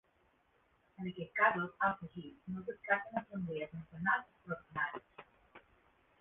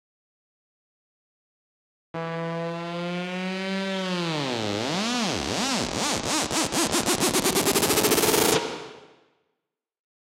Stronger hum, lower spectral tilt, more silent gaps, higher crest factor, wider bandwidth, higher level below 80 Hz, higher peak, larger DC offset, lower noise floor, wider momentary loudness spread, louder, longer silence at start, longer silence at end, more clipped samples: neither; about the same, -4 dB/octave vs -3 dB/octave; neither; about the same, 24 dB vs 24 dB; second, 3.9 kHz vs 16.5 kHz; second, -72 dBFS vs -54 dBFS; second, -16 dBFS vs -4 dBFS; neither; second, -74 dBFS vs -83 dBFS; first, 15 LU vs 11 LU; second, -37 LUFS vs -24 LUFS; second, 1 s vs 2.15 s; second, 0.6 s vs 1.2 s; neither